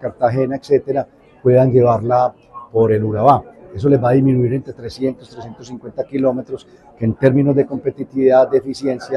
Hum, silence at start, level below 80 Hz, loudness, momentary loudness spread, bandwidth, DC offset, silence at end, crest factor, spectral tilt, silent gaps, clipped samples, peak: none; 0 s; -50 dBFS; -16 LUFS; 18 LU; 10.5 kHz; under 0.1%; 0 s; 16 dB; -9 dB/octave; none; under 0.1%; 0 dBFS